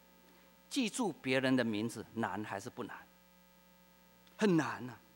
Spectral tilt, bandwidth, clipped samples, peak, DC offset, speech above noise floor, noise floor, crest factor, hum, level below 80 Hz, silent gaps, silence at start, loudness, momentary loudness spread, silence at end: -5 dB/octave; 16 kHz; under 0.1%; -18 dBFS; under 0.1%; 29 dB; -64 dBFS; 20 dB; none; -78 dBFS; none; 0.7 s; -36 LUFS; 14 LU; 0.2 s